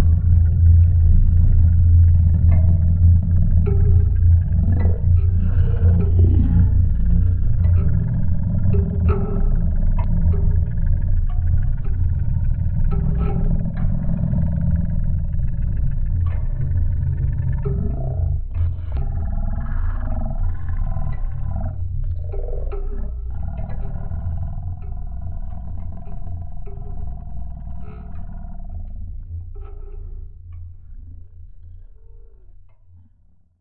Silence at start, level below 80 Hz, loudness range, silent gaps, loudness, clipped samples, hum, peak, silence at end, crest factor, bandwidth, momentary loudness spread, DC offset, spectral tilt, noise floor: 0 s; -22 dBFS; 19 LU; none; -20 LUFS; under 0.1%; none; -4 dBFS; 1.35 s; 14 dB; 2.6 kHz; 19 LU; under 0.1%; -14 dB/octave; -55 dBFS